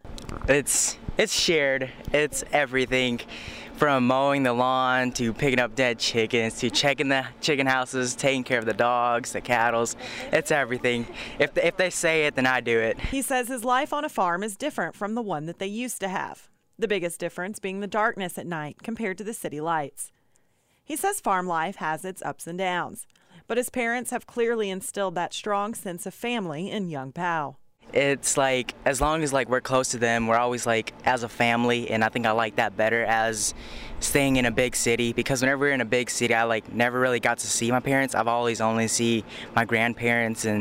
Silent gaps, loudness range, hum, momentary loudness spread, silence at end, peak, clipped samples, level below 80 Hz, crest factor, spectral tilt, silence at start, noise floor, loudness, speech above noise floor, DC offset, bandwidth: none; 6 LU; none; 9 LU; 0 s; -8 dBFS; under 0.1%; -48 dBFS; 16 dB; -3.5 dB/octave; 0.05 s; -67 dBFS; -25 LUFS; 42 dB; under 0.1%; 16 kHz